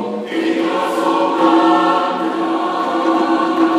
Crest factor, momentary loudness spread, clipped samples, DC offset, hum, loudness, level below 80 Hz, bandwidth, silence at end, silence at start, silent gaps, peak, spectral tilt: 16 dB; 6 LU; under 0.1%; under 0.1%; none; -16 LUFS; -78 dBFS; 11.5 kHz; 0 s; 0 s; none; 0 dBFS; -5 dB/octave